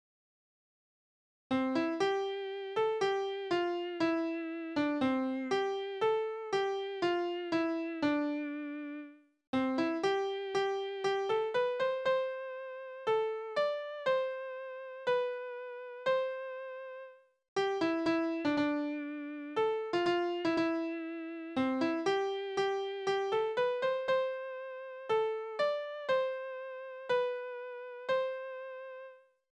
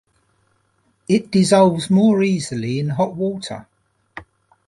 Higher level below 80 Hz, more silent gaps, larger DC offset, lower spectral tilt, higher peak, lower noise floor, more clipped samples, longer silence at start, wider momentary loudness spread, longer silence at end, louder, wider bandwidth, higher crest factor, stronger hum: second, -76 dBFS vs -58 dBFS; first, 9.47-9.53 s, 17.48-17.56 s vs none; neither; about the same, -5 dB/octave vs -6 dB/octave; second, -20 dBFS vs -2 dBFS; second, -54 dBFS vs -64 dBFS; neither; first, 1.5 s vs 1.1 s; second, 11 LU vs 25 LU; about the same, 0.4 s vs 0.45 s; second, -34 LUFS vs -18 LUFS; second, 9.8 kHz vs 11.5 kHz; about the same, 14 dB vs 18 dB; neither